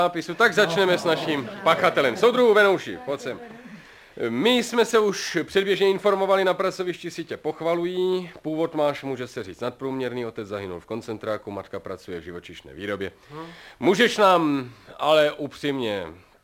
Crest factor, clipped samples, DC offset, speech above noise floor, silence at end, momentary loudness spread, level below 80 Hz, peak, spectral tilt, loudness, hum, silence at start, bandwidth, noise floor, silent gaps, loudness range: 20 dB; under 0.1%; under 0.1%; 22 dB; 0.3 s; 17 LU; -62 dBFS; -4 dBFS; -4.5 dB/octave; -23 LUFS; none; 0 s; 17 kHz; -46 dBFS; none; 11 LU